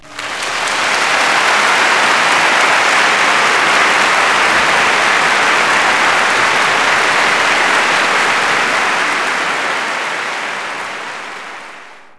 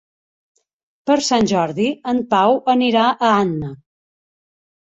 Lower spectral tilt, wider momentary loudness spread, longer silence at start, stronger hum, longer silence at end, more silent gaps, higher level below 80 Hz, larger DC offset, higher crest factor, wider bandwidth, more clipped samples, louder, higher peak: second, -0.5 dB/octave vs -5 dB/octave; about the same, 10 LU vs 8 LU; second, 0.05 s vs 1.05 s; neither; second, 0.1 s vs 1.1 s; neither; about the same, -54 dBFS vs -56 dBFS; neither; about the same, 14 dB vs 16 dB; first, 11 kHz vs 8.2 kHz; neither; first, -11 LUFS vs -17 LUFS; about the same, 0 dBFS vs -2 dBFS